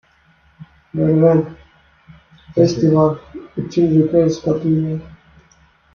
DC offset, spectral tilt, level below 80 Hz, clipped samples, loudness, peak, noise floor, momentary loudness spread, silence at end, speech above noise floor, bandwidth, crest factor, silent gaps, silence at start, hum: under 0.1%; -8.5 dB/octave; -48 dBFS; under 0.1%; -16 LUFS; -2 dBFS; -54 dBFS; 15 LU; 0.85 s; 40 dB; 7 kHz; 16 dB; none; 0.6 s; none